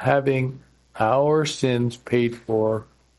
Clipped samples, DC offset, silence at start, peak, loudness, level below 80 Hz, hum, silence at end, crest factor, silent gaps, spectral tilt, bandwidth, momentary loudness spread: under 0.1%; under 0.1%; 0 s; -6 dBFS; -22 LUFS; -58 dBFS; none; 0.35 s; 18 dB; none; -6 dB/octave; 11.5 kHz; 6 LU